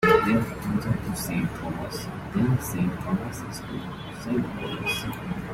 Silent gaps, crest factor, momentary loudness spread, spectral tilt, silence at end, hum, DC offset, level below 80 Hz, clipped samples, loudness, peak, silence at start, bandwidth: none; 22 dB; 10 LU; -6 dB/octave; 0 s; none; under 0.1%; -46 dBFS; under 0.1%; -28 LUFS; -4 dBFS; 0 s; 16.5 kHz